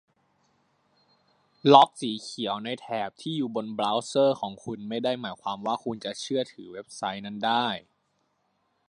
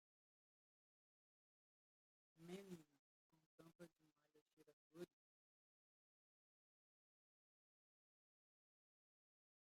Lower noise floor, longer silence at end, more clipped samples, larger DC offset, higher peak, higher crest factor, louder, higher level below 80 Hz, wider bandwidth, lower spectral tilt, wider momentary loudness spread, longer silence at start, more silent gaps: second, -73 dBFS vs -83 dBFS; second, 1.1 s vs 4.7 s; neither; neither; first, -2 dBFS vs -42 dBFS; about the same, 26 dB vs 26 dB; first, -27 LUFS vs -62 LUFS; first, -74 dBFS vs under -90 dBFS; second, 11 kHz vs 16 kHz; about the same, -5 dB/octave vs -6 dB/octave; first, 15 LU vs 10 LU; second, 1.65 s vs 2.35 s; second, none vs 2.99-3.30 s, 3.46-3.58 s, 3.75-3.79 s, 4.42-4.46 s, 4.53-4.57 s, 4.73-4.90 s